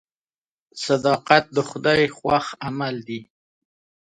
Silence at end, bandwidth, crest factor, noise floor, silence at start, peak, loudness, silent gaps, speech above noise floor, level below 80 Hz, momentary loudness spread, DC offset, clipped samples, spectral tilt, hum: 0.9 s; 11 kHz; 22 dB; under -90 dBFS; 0.75 s; 0 dBFS; -21 LUFS; none; over 69 dB; -56 dBFS; 15 LU; under 0.1%; under 0.1%; -5 dB/octave; none